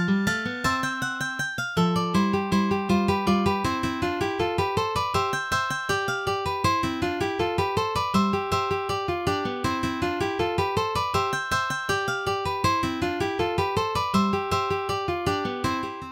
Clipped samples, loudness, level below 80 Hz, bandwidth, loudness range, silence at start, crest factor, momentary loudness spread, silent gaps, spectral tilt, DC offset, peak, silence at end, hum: under 0.1%; -25 LUFS; -48 dBFS; 17 kHz; 1 LU; 0 s; 16 dB; 4 LU; none; -5 dB/octave; under 0.1%; -10 dBFS; 0 s; none